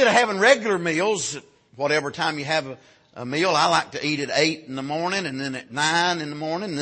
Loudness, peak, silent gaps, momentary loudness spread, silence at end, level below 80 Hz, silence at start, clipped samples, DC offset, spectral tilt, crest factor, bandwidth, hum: -22 LUFS; -4 dBFS; none; 12 LU; 0 s; -66 dBFS; 0 s; under 0.1%; under 0.1%; -3.5 dB/octave; 20 dB; 8.8 kHz; none